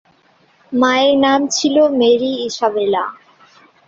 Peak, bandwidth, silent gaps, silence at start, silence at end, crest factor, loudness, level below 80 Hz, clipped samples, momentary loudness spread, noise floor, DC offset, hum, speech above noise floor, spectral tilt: -2 dBFS; 7.8 kHz; none; 0.7 s; 0.75 s; 14 dB; -15 LUFS; -60 dBFS; under 0.1%; 8 LU; -54 dBFS; under 0.1%; none; 40 dB; -3 dB/octave